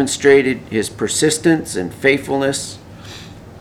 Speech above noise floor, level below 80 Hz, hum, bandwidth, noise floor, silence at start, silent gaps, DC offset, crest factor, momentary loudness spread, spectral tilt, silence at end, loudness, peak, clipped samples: 19 dB; -48 dBFS; none; 15.5 kHz; -36 dBFS; 0 s; none; under 0.1%; 16 dB; 22 LU; -4 dB/octave; 0 s; -16 LUFS; 0 dBFS; under 0.1%